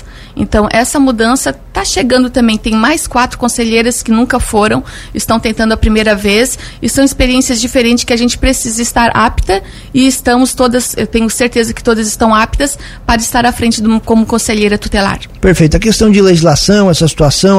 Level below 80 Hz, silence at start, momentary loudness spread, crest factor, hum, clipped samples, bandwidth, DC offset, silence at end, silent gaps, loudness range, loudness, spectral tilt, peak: -24 dBFS; 0 s; 7 LU; 10 dB; none; 0.2%; 15.5 kHz; under 0.1%; 0 s; none; 2 LU; -10 LUFS; -4 dB/octave; 0 dBFS